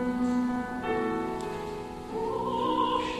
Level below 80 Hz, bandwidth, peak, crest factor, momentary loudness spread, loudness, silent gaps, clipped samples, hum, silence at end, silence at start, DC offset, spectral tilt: -52 dBFS; 12.5 kHz; -16 dBFS; 14 dB; 9 LU; -30 LUFS; none; under 0.1%; none; 0 s; 0 s; under 0.1%; -6 dB/octave